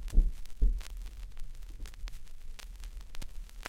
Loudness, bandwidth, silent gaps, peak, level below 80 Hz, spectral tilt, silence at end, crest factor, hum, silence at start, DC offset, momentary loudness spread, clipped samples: -41 LUFS; 12 kHz; none; -12 dBFS; -34 dBFS; -5 dB/octave; 0 s; 20 dB; none; 0 s; under 0.1%; 16 LU; under 0.1%